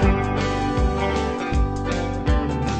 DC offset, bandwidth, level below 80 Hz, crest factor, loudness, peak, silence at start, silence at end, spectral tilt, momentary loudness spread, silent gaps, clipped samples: under 0.1%; 9.2 kHz; -26 dBFS; 14 dB; -23 LUFS; -6 dBFS; 0 s; 0 s; -6.5 dB/octave; 2 LU; none; under 0.1%